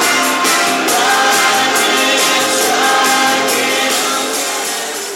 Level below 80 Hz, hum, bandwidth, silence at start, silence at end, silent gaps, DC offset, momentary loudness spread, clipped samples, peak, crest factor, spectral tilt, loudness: -72 dBFS; none; 16.5 kHz; 0 s; 0 s; none; under 0.1%; 5 LU; under 0.1%; 0 dBFS; 12 dB; 0 dB/octave; -12 LUFS